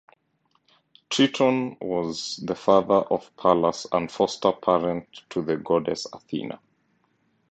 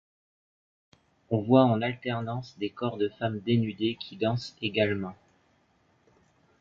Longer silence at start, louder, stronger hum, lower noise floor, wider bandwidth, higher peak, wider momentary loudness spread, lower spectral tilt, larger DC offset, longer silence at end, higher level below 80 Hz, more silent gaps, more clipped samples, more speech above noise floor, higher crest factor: second, 1.1 s vs 1.3 s; first, -24 LUFS vs -28 LUFS; neither; about the same, -69 dBFS vs -67 dBFS; first, 9 kHz vs 7.2 kHz; first, -2 dBFS vs -6 dBFS; about the same, 12 LU vs 13 LU; second, -5 dB/octave vs -7.5 dB/octave; neither; second, 0.95 s vs 1.45 s; about the same, -62 dBFS vs -62 dBFS; neither; neither; first, 46 dB vs 40 dB; about the same, 22 dB vs 22 dB